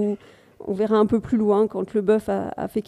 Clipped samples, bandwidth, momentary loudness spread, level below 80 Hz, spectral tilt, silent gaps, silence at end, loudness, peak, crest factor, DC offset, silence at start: under 0.1%; 13 kHz; 10 LU; -54 dBFS; -8 dB/octave; none; 0.05 s; -22 LUFS; -6 dBFS; 16 dB; under 0.1%; 0 s